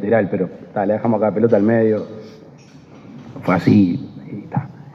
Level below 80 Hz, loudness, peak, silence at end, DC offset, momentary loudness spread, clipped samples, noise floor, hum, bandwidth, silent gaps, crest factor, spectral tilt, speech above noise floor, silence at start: -62 dBFS; -18 LUFS; 0 dBFS; 0 s; under 0.1%; 19 LU; under 0.1%; -42 dBFS; none; 7 kHz; none; 18 dB; -9.5 dB/octave; 26 dB; 0 s